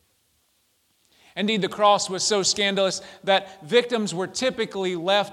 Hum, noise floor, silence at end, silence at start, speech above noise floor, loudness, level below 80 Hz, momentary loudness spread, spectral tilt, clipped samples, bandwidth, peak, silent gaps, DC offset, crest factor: none; -67 dBFS; 0 s; 1.35 s; 44 dB; -23 LUFS; -68 dBFS; 8 LU; -3 dB/octave; under 0.1%; 14 kHz; -6 dBFS; none; under 0.1%; 20 dB